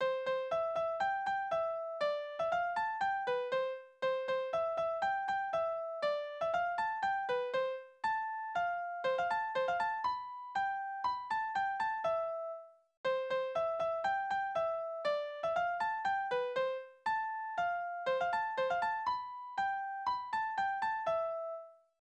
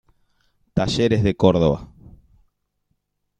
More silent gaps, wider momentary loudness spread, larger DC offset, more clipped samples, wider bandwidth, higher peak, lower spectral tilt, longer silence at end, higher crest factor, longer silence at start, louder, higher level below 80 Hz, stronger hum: first, 12.97-13.04 s vs none; second, 4 LU vs 10 LU; neither; neither; second, 9 kHz vs 10 kHz; second, -22 dBFS vs -2 dBFS; second, -3.5 dB/octave vs -7 dB/octave; second, 0.3 s vs 1.55 s; second, 12 dB vs 20 dB; second, 0 s vs 0.75 s; second, -36 LUFS vs -20 LUFS; second, -74 dBFS vs -44 dBFS; second, none vs 50 Hz at -45 dBFS